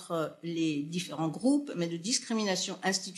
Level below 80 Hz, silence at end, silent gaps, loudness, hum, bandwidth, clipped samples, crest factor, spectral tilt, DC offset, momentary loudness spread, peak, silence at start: -82 dBFS; 0 s; none; -31 LUFS; none; 13 kHz; under 0.1%; 18 dB; -4 dB/octave; under 0.1%; 6 LU; -14 dBFS; 0 s